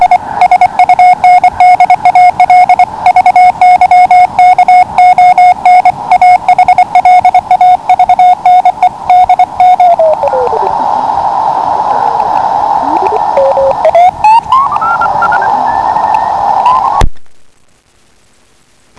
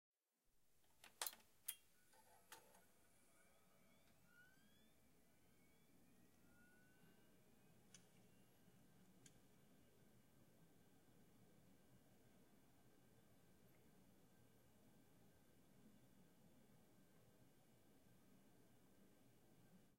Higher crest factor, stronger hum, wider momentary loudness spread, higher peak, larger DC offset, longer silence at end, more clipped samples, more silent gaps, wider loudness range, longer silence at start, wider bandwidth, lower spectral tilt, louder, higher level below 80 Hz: second, 6 dB vs 40 dB; neither; second, 6 LU vs 18 LU; first, 0 dBFS vs -28 dBFS; neither; first, 1.6 s vs 0 s; first, 7% vs under 0.1%; neither; about the same, 5 LU vs 5 LU; about the same, 0 s vs 0.1 s; second, 11 kHz vs 16 kHz; first, -4.5 dB/octave vs -2 dB/octave; first, -6 LUFS vs -55 LUFS; first, -28 dBFS vs -90 dBFS